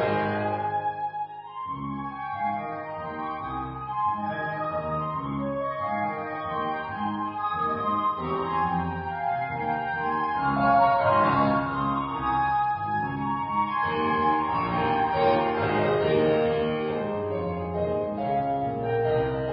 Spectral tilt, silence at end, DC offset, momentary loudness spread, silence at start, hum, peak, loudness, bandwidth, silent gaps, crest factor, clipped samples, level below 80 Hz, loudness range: -5 dB/octave; 0 s; under 0.1%; 10 LU; 0 s; none; -10 dBFS; -26 LUFS; 5.2 kHz; none; 16 dB; under 0.1%; -52 dBFS; 7 LU